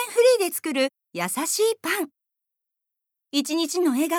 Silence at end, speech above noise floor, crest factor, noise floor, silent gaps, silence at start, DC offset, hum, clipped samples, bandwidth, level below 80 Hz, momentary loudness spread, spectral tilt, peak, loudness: 0 s; 60 dB; 16 dB; -84 dBFS; none; 0 s; under 0.1%; none; under 0.1%; 20 kHz; -88 dBFS; 9 LU; -2.5 dB/octave; -8 dBFS; -23 LUFS